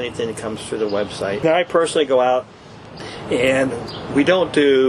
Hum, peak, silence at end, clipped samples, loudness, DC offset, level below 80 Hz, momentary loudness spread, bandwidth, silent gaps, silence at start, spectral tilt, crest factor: none; -4 dBFS; 0 s; under 0.1%; -19 LUFS; under 0.1%; -50 dBFS; 15 LU; 12.5 kHz; none; 0 s; -5 dB/octave; 14 dB